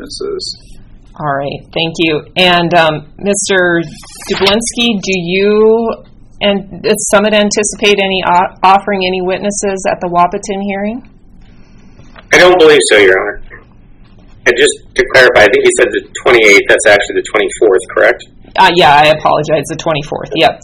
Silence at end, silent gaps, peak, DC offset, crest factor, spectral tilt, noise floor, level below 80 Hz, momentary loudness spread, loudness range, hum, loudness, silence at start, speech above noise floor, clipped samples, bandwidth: 0.05 s; none; 0 dBFS; under 0.1%; 10 dB; -3.5 dB/octave; -38 dBFS; -38 dBFS; 13 LU; 5 LU; none; -10 LUFS; 0 s; 28 dB; 1%; 16.5 kHz